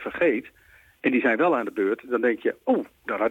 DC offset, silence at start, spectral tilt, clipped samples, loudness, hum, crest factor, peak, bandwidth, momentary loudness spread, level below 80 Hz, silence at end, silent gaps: under 0.1%; 0 s; -7 dB/octave; under 0.1%; -24 LUFS; none; 12 dB; -12 dBFS; 15.5 kHz; 6 LU; -66 dBFS; 0 s; none